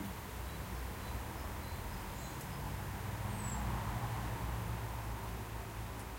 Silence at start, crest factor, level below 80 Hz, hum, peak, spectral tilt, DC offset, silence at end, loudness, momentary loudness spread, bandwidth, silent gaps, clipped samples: 0 s; 14 dB; -46 dBFS; none; -26 dBFS; -5 dB/octave; under 0.1%; 0 s; -42 LUFS; 5 LU; 16.5 kHz; none; under 0.1%